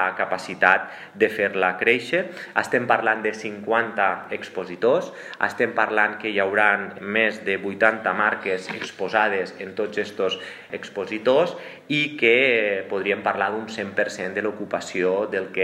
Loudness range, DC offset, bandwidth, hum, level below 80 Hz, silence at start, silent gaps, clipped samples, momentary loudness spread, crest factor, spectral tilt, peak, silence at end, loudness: 3 LU; under 0.1%; 13.5 kHz; none; -76 dBFS; 0 s; none; under 0.1%; 11 LU; 22 dB; -4.5 dB/octave; -2 dBFS; 0 s; -22 LUFS